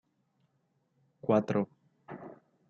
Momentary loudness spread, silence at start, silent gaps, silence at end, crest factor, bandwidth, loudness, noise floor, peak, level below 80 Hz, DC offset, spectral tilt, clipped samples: 21 LU; 1.25 s; none; 0.35 s; 24 dB; 7.2 kHz; -31 LUFS; -76 dBFS; -12 dBFS; -80 dBFS; under 0.1%; -8.5 dB/octave; under 0.1%